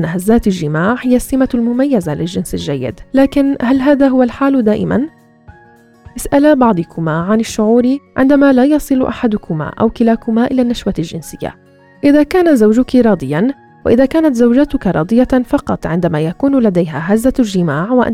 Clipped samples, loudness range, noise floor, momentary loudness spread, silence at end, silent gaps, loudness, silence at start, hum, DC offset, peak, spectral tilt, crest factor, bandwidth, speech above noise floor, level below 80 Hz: under 0.1%; 3 LU; -44 dBFS; 9 LU; 0 s; none; -13 LUFS; 0 s; none; under 0.1%; 0 dBFS; -7 dB/octave; 12 dB; 15 kHz; 32 dB; -36 dBFS